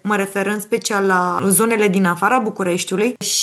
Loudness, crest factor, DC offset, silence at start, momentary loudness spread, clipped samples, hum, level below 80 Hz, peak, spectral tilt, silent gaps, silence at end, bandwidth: -17 LUFS; 14 dB; under 0.1%; 0.05 s; 6 LU; under 0.1%; none; -74 dBFS; -2 dBFS; -4 dB/octave; none; 0 s; 13 kHz